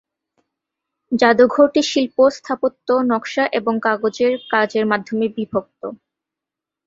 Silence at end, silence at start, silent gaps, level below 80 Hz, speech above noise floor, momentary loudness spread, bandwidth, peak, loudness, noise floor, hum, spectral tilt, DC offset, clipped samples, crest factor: 0.9 s; 1.1 s; none; -62 dBFS; 68 dB; 11 LU; 7.8 kHz; -2 dBFS; -18 LUFS; -86 dBFS; none; -4.5 dB/octave; under 0.1%; under 0.1%; 18 dB